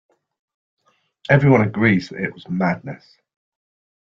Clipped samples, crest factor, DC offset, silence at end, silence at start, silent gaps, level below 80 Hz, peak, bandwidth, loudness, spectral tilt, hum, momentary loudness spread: under 0.1%; 20 dB; under 0.1%; 1.15 s; 1.3 s; none; -54 dBFS; -2 dBFS; 7 kHz; -18 LUFS; -8.5 dB/octave; none; 22 LU